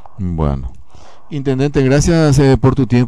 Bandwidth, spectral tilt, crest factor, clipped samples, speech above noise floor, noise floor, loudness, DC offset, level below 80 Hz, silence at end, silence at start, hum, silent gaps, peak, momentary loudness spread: 11 kHz; -7 dB/octave; 10 dB; under 0.1%; 31 dB; -43 dBFS; -14 LUFS; 4%; -26 dBFS; 0 s; 0.2 s; none; none; -2 dBFS; 14 LU